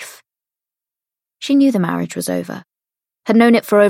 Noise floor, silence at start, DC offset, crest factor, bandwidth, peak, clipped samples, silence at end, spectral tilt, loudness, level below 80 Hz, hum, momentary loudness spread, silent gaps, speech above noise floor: -89 dBFS; 0 s; under 0.1%; 16 dB; 16.5 kHz; 0 dBFS; under 0.1%; 0 s; -5.5 dB/octave; -15 LUFS; -68 dBFS; none; 19 LU; none; 75 dB